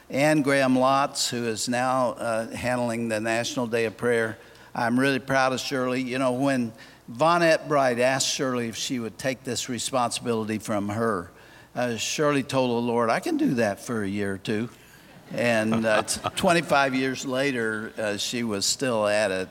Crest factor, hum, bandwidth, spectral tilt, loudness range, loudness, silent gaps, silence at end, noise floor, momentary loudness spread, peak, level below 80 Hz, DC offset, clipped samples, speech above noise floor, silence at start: 18 dB; none; 17 kHz; -4 dB/octave; 3 LU; -25 LUFS; none; 0 s; -49 dBFS; 8 LU; -6 dBFS; -62 dBFS; under 0.1%; under 0.1%; 25 dB; 0.1 s